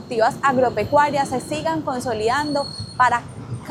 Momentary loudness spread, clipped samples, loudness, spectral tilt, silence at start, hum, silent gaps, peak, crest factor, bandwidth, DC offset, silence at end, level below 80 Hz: 7 LU; under 0.1%; -20 LUFS; -5 dB/octave; 0 s; none; none; -4 dBFS; 18 dB; 15 kHz; under 0.1%; 0 s; -50 dBFS